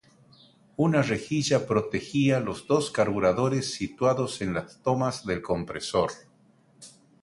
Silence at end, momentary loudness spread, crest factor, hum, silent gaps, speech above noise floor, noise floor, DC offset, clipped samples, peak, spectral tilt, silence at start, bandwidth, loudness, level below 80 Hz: 0.35 s; 7 LU; 20 dB; none; none; 35 dB; -61 dBFS; under 0.1%; under 0.1%; -8 dBFS; -5.5 dB/octave; 0.8 s; 11.5 kHz; -26 LUFS; -56 dBFS